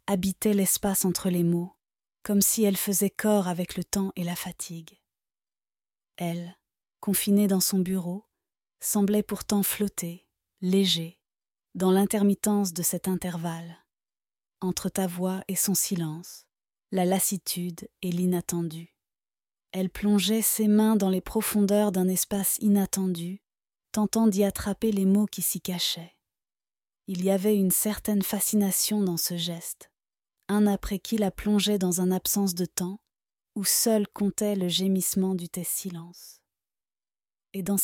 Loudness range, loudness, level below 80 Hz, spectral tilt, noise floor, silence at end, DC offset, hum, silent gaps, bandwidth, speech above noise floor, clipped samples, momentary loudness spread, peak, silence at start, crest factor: 5 LU; -26 LUFS; -56 dBFS; -4.5 dB/octave; under -90 dBFS; 0 s; under 0.1%; none; none; 18 kHz; over 64 dB; under 0.1%; 13 LU; -10 dBFS; 0.1 s; 18 dB